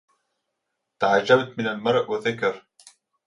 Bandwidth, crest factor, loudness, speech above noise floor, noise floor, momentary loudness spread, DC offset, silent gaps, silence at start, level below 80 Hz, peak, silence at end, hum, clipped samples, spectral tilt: 11 kHz; 22 dB; -22 LUFS; 58 dB; -80 dBFS; 9 LU; under 0.1%; none; 1 s; -68 dBFS; -4 dBFS; 0.65 s; none; under 0.1%; -5 dB/octave